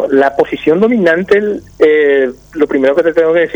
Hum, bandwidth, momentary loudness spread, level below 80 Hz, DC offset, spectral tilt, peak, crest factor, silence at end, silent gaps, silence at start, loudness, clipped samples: none; 7.8 kHz; 5 LU; -46 dBFS; under 0.1%; -7 dB/octave; 0 dBFS; 10 dB; 0 s; none; 0 s; -11 LUFS; under 0.1%